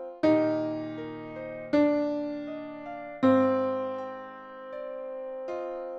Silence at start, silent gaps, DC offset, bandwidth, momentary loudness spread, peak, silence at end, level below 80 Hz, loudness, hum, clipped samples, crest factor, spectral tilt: 0 s; none; under 0.1%; 6.6 kHz; 15 LU; -10 dBFS; 0 s; -68 dBFS; -29 LUFS; none; under 0.1%; 18 dB; -8 dB/octave